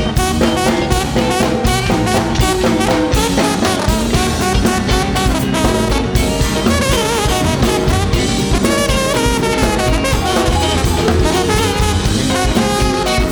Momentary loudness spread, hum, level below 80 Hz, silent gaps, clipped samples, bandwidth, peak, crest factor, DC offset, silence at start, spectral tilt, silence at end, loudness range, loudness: 1 LU; none; -22 dBFS; none; under 0.1%; over 20 kHz; 0 dBFS; 12 dB; under 0.1%; 0 s; -4.5 dB/octave; 0 s; 0 LU; -14 LUFS